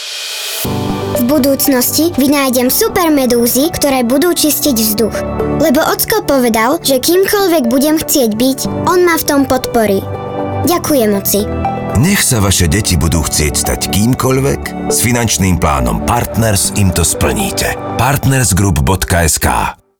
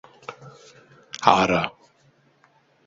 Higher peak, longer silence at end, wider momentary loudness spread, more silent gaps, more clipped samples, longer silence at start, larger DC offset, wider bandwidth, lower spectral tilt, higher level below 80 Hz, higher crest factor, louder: about the same, -2 dBFS vs 0 dBFS; second, 0.25 s vs 1.15 s; second, 6 LU vs 23 LU; neither; neither; second, 0 s vs 0.3 s; neither; first, over 20 kHz vs 7.8 kHz; about the same, -4.5 dB/octave vs -4.5 dB/octave; first, -28 dBFS vs -56 dBFS; second, 10 dB vs 26 dB; first, -12 LUFS vs -20 LUFS